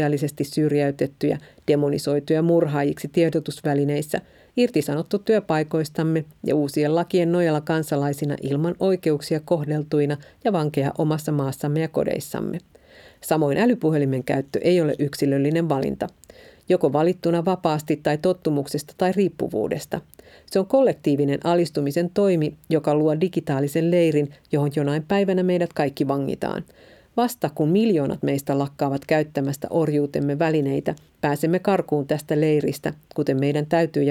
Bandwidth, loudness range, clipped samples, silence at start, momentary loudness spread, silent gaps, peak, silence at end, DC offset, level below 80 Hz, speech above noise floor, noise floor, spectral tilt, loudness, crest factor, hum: 16.5 kHz; 2 LU; under 0.1%; 0 s; 7 LU; none; -4 dBFS; 0 s; under 0.1%; -58 dBFS; 28 dB; -50 dBFS; -7 dB/octave; -22 LUFS; 18 dB; none